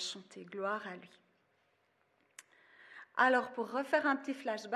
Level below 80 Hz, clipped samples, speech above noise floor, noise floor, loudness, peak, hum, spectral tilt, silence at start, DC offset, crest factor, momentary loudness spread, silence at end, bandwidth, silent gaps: under -90 dBFS; under 0.1%; 40 dB; -75 dBFS; -34 LUFS; -16 dBFS; none; -3 dB/octave; 0 s; under 0.1%; 22 dB; 20 LU; 0 s; 13.5 kHz; none